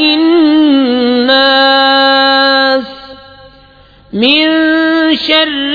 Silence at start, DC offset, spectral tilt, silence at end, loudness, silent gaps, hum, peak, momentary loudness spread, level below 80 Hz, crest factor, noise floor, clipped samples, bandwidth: 0 s; under 0.1%; -5 dB/octave; 0 s; -8 LUFS; none; none; 0 dBFS; 5 LU; -48 dBFS; 10 dB; -41 dBFS; under 0.1%; 5 kHz